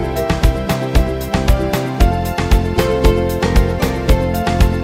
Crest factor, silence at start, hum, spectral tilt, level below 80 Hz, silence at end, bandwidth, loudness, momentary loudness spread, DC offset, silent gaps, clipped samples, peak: 14 dB; 0 s; none; -6 dB/octave; -18 dBFS; 0 s; 16.5 kHz; -16 LUFS; 4 LU; under 0.1%; none; under 0.1%; 0 dBFS